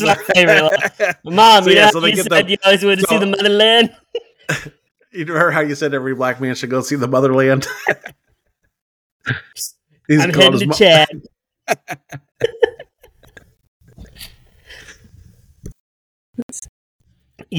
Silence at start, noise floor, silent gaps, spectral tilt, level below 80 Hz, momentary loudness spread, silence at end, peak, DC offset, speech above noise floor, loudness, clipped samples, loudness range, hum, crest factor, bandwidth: 0 s; -65 dBFS; 8.81-9.20 s, 13.68-13.80 s, 15.80-16.34 s, 16.43-16.49 s, 16.69-16.99 s; -4 dB/octave; -52 dBFS; 19 LU; 0 s; 0 dBFS; under 0.1%; 52 dB; -13 LUFS; under 0.1%; 15 LU; none; 16 dB; 19.5 kHz